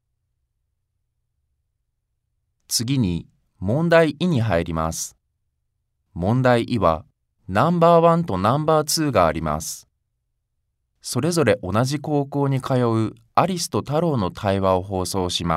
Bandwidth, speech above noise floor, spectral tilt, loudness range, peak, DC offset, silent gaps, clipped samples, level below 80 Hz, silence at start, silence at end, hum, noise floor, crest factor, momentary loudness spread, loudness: 16 kHz; 55 dB; -5.5 dB/octave; 5 LU; -2 dBFS; under 0.1%; none; under 0.1%; -46 dBFS; 2.7 s; 0 s; none; -75 dBFS; 20 dB; 10 LU; -20 LUFS